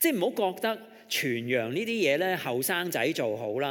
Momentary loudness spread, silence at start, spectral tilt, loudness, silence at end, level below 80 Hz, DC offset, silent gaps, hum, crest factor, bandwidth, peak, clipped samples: 6 LU; 0 s; -3.5 dB/octave; -28 LUFS; 0 s; -84 dBFS; under 0.1%; none; none; 16 dB; 17.5 kHz; -12 dBFS; under 0.1%